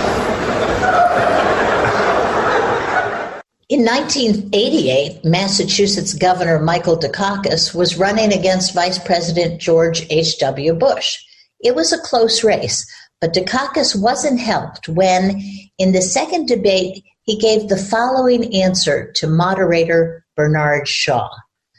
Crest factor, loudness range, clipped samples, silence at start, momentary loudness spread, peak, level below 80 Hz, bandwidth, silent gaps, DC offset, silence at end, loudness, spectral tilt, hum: 12 dB; 1 LU; under 0.1%; 0 s; 6 LU; -4 dBFS; -44 dBFS; 12 kHz; none; under 0.1%; 0.4 s; -15 LUFS; -4 dB/octave; none